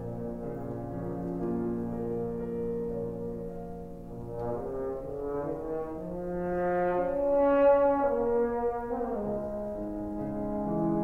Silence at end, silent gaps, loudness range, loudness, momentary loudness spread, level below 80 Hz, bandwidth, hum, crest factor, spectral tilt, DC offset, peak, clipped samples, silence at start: 0 s; none; 9 LU; -31 LUFS; 12 LU; -48 dBFS; 4.1 kHz; none; 16 dB; -10 dB/octave; under 0.1%; -14 dBFS; under 0.1%; 0 s